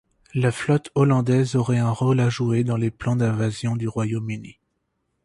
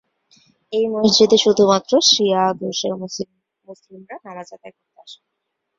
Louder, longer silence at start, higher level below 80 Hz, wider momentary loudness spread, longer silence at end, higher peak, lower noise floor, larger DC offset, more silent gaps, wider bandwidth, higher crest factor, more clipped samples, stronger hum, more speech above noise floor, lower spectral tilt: second, -22 LUFS vs -16 LUFS; second, 0.35 s vs 0.7 s; first, -54 dBFS vs -62 dBFS; second, 7 LU vs 23 LU; about the same, 0.75 s vs 0.65 s; second, -6 dBFS vs 0 dBFS; about the same, -74 dBFS vs -77 dBFS; neither; neither; first, 11.5 kHz vs 7.8 kHz; about the same, 16 dB vs 20 dB; neither; neither; second, 53 dB vs 58 dB; first, -7.5 dB/octave vs -3.5 dB/octave